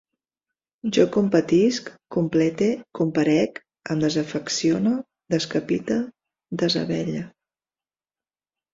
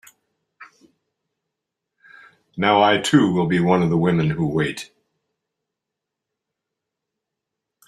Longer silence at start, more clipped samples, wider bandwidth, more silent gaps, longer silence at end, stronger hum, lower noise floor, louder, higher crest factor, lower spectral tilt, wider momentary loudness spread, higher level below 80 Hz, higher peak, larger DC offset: first, 0.85 s vs 0.6 s; neither; second, 7.8 kHz vs 13 kHz; neither; second, 1.45 s vs 3.05 s; neither; first, under -90 dBFS vs -83 dBFS; second, -23 LUFS vs -18 LUFS; about the same, 20 dB vs 20 dB; about the same, -5.5 dB/octave vs -6 dB/octave; second, 11 LU vs 14 LU; second, -62 dBFS vs -56 dBFS; about the same, -4 dBFS vs -2 dBFS; neither